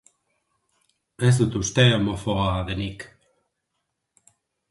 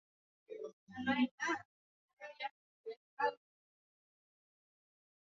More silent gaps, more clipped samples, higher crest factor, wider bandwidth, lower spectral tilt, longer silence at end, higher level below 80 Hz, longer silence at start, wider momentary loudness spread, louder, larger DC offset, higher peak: second, none vs 0.73-0.87 s, 1.31-1.38 s, 1.65-2.17 s, 2.51-2.84 s, 2.96-3.17 s; neither; about the same, 20 dB vs 22 dB; first, 11.5 kHz vs 7.2 kHz; first, -5 dB/octave vs -2 dB/octave; second, 1.65 s vs 2.05 s; first, -44 dBFS vs -80 dBFS; first, 1.2 s vs 0.5 s; second, 14 LU vs 19 LU; first, -22 LUFS vs -40 LUFS; neither; first, -4 dBFS vs -22 dBFS